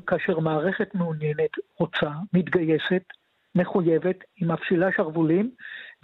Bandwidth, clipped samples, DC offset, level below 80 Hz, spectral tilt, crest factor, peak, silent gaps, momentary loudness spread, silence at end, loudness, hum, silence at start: 4.5 kHz; under 0.1%; under 0.1%; -64 dBFS; -9.5 dB/octave; 14 dB; -10 dBFS; none; 6 LU; 0.1 s; -25 LUFS; none; 0.05 s